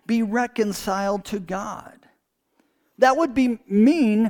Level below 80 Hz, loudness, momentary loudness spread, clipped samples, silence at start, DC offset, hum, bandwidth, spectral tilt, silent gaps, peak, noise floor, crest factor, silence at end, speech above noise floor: -54 dBFS; -21 LUFS; 12 LU; under 0.1%; 0.1 s; under 0.1%; none; 18.5 kHz; -5.5 dB/octave; none; -2 dBFS; -68 dBFS; 20 dB; 0 s; 47 dB